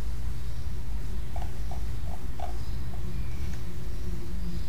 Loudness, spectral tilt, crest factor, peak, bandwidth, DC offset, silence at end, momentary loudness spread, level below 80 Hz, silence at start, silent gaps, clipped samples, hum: -37 LUFS; -6.5 dB/octave; 12 dB; -16 dBFS; 15.5 kHz; 7%; 0 s; 2 LU; -36 dBFS; 0 s; none; under 0.1%; none